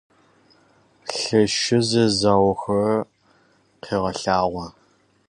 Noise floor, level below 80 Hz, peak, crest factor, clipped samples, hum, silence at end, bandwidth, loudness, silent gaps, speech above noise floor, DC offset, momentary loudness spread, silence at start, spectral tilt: -60 dBFS; -50 dBFS; -4 dBFS; 18 dB; under 0.1%; none; 0.6 s; 11 kHz; -21 LUFS; none; 41 dB; under 0.1%; 15 LU; 1.05 s; -4.5 dB/octave